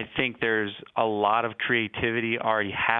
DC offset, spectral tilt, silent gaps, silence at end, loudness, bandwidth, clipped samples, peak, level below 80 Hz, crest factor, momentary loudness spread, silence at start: under 0.1%; -8 dB/octave; none; 0 s; -26 LUFS; 4.2 kHz; under 0.1%; -4 dBFS; -58 dBFS; 22 dB; 4 LU; 0 s